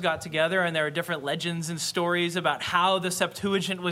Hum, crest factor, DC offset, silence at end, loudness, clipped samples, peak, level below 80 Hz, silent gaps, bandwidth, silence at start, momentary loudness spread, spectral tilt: none; 18 dB; under 0.1%; 0 s; -26 LUFS; under 0.1%; -8 dBFS; -64 dBFS; none; 16.5 kHz; 0 s; 6 LU; -3.5 dB/octave